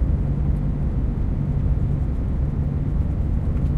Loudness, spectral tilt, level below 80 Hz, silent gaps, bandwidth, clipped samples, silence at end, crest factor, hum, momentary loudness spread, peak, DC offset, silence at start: -24 LUFS; -11 dB/octave; -24 dBFS; none; 3.8 kHz; under 0.1%; 0 s; 12 dB; none; 2 LU; -10 dBFS; under 0.1%; 0 s